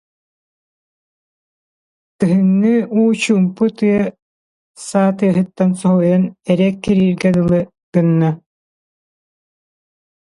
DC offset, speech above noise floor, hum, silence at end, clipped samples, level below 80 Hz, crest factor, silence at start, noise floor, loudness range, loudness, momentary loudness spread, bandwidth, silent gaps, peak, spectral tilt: under 0.1%; over 76 dB; none; 1.9 s; under 0.1%; -52 dBFS; 16 dB; 2.2 s; under -90 dBFS; 3 LU; -15 LUFS; 6 LU; 11.5 kHz; 4.22-4.74 s, 7.83-7.92 s; -2 dBFS; -7.5 dB/octave